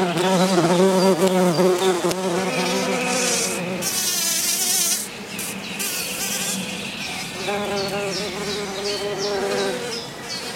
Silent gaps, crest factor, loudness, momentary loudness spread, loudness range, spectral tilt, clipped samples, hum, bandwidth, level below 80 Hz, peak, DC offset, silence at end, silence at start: none; 18 dB; -21 LUFS; 10 LU; 6 LU; -3 dB/octave; under 0.1%; none; 16.5 kHz; -60 dBFS; -4 dBFS; under 0.1%; 0 s; 0 s